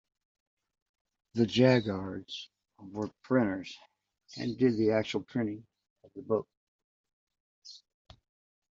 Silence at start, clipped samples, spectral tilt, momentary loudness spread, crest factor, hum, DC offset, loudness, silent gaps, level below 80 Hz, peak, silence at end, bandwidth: 1.35 s; under 0.1%; -5.5 dB/octave; 25 LU; 22 dB; none; under 0.1%; -30 LUFS; 5.90-5.96 s, 6.57-7.04 s, 7.13-7.27 s, 7.40-7.62 s; -68 dBFS; -10 dBFS; 1 s; 7.6 kHz